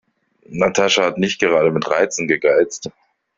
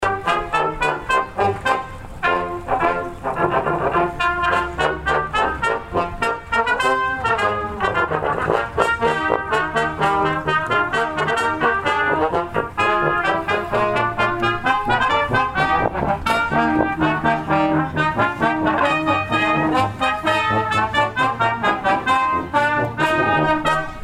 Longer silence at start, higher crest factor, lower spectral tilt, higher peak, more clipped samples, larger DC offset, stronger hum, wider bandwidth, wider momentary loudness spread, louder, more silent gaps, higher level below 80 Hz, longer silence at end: first, 0.5 s vs 0 s; about the same, 18 dB vs 18 dB; second, -3.5 dB/octave vs -5.5 dB/octave; about the same, 0 dBFS vs -2 dBFS; neither; neither; neither; second, 7.8 kHz vs 15.5 kHz; first, 11 LU vs 4 LU; about the same, -17 LUFS vs -19 LUFS; neither; second, -56 dBFS vs -40 dBFS; first, 0.5 s vs 0 s